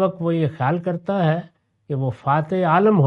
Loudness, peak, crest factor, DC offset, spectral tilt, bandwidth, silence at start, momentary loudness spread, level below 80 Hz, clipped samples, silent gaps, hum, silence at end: -21 LUFS; -4 dBFS; 16 dB; under 0.1%; -10 dB/octave; 5 kHz; 0 s; 8 LU; -62 dBFS; under 0.1%; none; none; 0 s